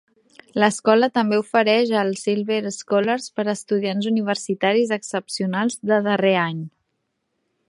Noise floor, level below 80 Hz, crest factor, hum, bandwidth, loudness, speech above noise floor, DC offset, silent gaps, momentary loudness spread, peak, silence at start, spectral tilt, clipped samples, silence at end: -74 dBFS; -72 dBFS; 20 dB; none; 11.5 kHz; -21 LUFS; 54 dB; under 0.1%; none; 8 LU; 0 dBFS; 0.55 s; -4.5 dB/octave; under 0.1%; 1 s